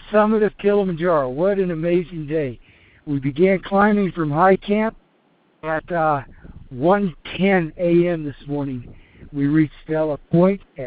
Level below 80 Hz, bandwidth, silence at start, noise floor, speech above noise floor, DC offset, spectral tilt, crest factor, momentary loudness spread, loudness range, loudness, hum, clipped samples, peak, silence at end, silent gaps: -46 dBFS; 4.8 kHz; 0 s; -60 dBFS; 41 dB; under 0.1%; -6.5 dB/octave; 16 dB; 10 LU; 2 LU; -20 LUFS; none; under 0.1%; -4 dBFS; 0 s; none